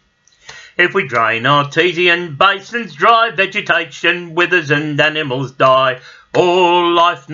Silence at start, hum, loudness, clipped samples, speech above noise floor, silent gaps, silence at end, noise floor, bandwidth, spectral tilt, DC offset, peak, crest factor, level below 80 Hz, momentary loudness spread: 0.5 s; none; -13 LUFS; under 0.1%; 29 dB; none; 0 s; -43 dBFS; 7.6 kHz; -5 dB/octave; under 0.1%; 0 dBFS; 14 dB; -60 dBFS; 7 LU